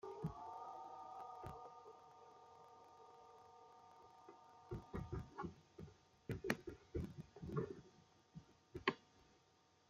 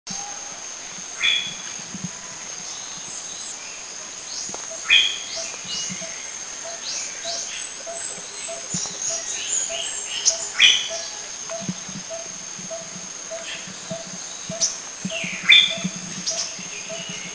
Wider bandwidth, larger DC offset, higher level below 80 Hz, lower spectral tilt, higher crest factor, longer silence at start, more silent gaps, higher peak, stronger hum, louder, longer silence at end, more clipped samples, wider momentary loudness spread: first, 15 kHz vs 8 kHz; neither; about the same, -66 dBFS vs -62 dBFS; first, -6 dB/octave vs 0 dB/octave; first, 32 dB vs 26 dB; about the same, 0.05 s vs 0.05 s; neither; second, -20 dBFS vs 0 dBFS; neither; second, -50 LUFS vs -23 LUFS; about the same, 0 s vs 0 s; neither; first, 19 LU vs 16 LU